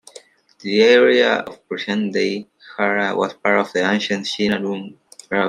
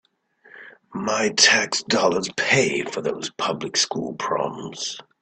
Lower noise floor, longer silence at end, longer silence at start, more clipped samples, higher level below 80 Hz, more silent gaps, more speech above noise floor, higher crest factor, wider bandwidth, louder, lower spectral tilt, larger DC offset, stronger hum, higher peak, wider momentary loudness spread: second, -46 dBFS vs -56 dBFS; second, 0 s vs 0.2 s; second, 0.15 s vs 0.55 s; neither; about the same, -64 dBFS vs -64 dBFS; neither; second, 28 dB vs 33 dB; about the same, 18 dB vs 22 dB; first, 11.5 kHz vs 9.4 kHz; first, -18 LUFS vs -21 LUFS; first, -4.5 dB/octave vs -2 dB/octave; neither; neither; about the same, -2 dBFS vs -2 dBFS; about the same, 17 LU vs 15 LU